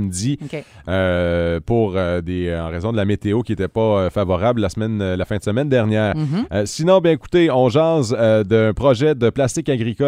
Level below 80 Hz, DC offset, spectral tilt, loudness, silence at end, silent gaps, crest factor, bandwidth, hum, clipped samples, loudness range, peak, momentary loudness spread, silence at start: -40 dBFS; under 0.1%; -6.5 dB/octave; -18 LUFS; 0 s; none; 16 dB; 13.5 kHz; none; under 0.1%; 4 LU; -2 dBFS; 7 LU; 0 s